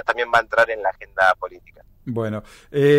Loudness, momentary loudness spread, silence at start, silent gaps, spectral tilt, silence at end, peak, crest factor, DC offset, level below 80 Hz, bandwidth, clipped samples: -21 LUFS; 14 LU; 0.05 s; none; -6 dB/octave; 0 s; -6 dBFS; 14 dB; under 0.1%; -52 dBFS; 15 kHz; under 0.1%